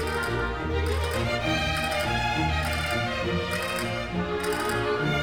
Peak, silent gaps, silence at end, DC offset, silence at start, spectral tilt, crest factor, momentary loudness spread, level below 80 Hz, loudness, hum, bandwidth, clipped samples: -14 dBFS; none; 0 s; 0.2%; 0 s; -5 dB/octave; 12 dB; 3 LU; -36 dBFS; -27 LUFS; none; 19.5 kHz; under 0.1%